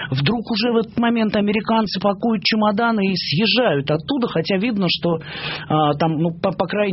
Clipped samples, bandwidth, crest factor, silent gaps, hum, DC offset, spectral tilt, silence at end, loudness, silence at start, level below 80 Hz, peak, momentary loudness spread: under 0.1%; 6 kHz; 16 dB; none; none; under 0.1%; -4 dB/octave; 0 s; -19 LUFS; 0 s; -52 dBFS; -2 dBFS; 4 LU